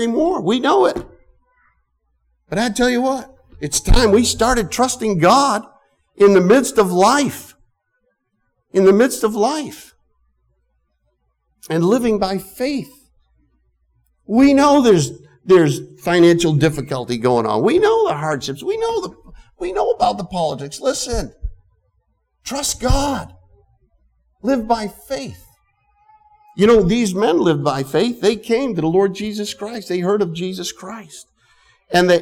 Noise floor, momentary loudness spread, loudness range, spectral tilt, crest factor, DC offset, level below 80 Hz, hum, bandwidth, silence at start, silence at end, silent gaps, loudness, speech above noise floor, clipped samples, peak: -69 dBFS; 15 LU; 8 LU; -5 dB/octave; 14 dB; under 0.1%; -32 dBFS; none; 17.5 kHz; 0 s; 0 s; none; -17 LUFS; 53 dB; under 0.1%; -2 dBFS